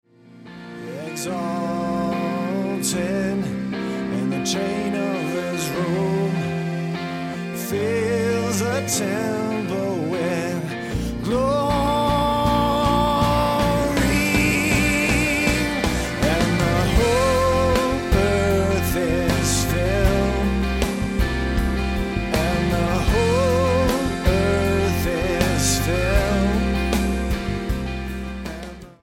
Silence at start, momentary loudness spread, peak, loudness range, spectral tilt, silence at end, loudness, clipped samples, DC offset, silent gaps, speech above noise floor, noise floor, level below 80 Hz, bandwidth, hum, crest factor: 0.35 s; 8 LU; -4 dBFS; 5 LU; -5 dB/octave; 0.1 s; -21 LUFS; under 0.1%; under 0.1%; none; 21 dB; -44 dBFS; -30 dBFS; 16.5 kHz; none; 18 dB